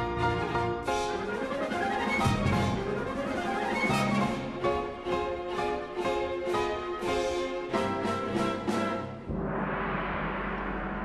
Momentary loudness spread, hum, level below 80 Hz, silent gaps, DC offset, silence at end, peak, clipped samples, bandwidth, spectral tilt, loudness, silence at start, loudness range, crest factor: 6 LU; none; -46 dBFS; none; under 0.1%; 0 s; -14 dBFS; under 0.1%; 13 kHz; -5.5 dB/octave; -30 LUFS; 0 s; 2 LU; 16 dB